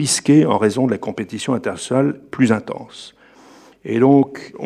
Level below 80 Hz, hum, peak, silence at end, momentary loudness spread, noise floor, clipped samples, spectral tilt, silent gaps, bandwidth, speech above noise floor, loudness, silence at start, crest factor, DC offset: -64 dBFS; none; -2 dBFS; 0 s; 18 LU; -46 dBFS; under 0.1%; -5.5 dB/octave; none; 13.5 kHz; 29 dB; -17 LUFS; 0 s; 16 dB; under 0.1%